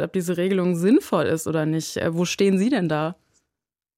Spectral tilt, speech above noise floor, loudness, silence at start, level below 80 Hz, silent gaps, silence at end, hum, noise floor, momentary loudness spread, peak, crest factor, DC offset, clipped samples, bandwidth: -6 dB/octave; 65 dB; -22 LUFS; 0 s; -62 dBFS; none; 0.85 s; none; -86 dBFS; 6 LU; -8 dBFS; 14 dB; under 0.1%; under 0.1%; 16.5 kHz